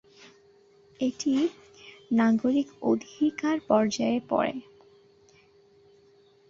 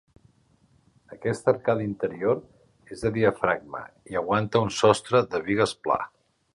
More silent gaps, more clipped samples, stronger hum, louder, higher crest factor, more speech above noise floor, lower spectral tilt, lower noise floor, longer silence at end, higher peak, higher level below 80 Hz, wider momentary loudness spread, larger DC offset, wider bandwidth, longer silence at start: neither; neither; neither; about the same, -27 LUFS vs -25 LUFS; about the same, 20 dB vs 22 dB; second, 34 dB vs 38 dB; about the same, -5 dB/octave vs -5.5 dB/octave; second, -59 dBFS vs -63 dBFS; first, 1.9 s vs 0.45 s; second, -10 dBFS vs -4 dBFS; second, -68 dBFS vs -56 dBFS; second, 8 LU vs 11 LU; neither; second, 7.6 kHz vs 11.5 kHz; about the same, 1 s vs 1.1 s